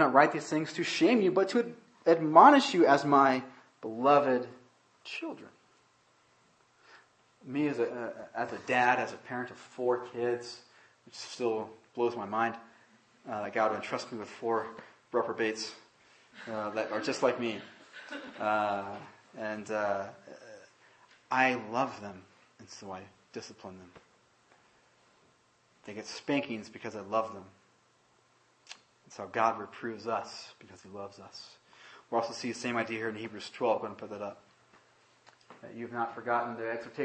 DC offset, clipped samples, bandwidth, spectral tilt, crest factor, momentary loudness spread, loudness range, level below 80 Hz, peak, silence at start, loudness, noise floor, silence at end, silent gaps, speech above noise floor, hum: under 0.1%; under 0.1%; 8.8 kHz; -5 dB/octave; 28 dB; 23 LU; 14 LU; -82 dBFS; -6 dBFS; 0 s; -30 LUFS; -68 dBFS; 0 s; none; 37 dB; none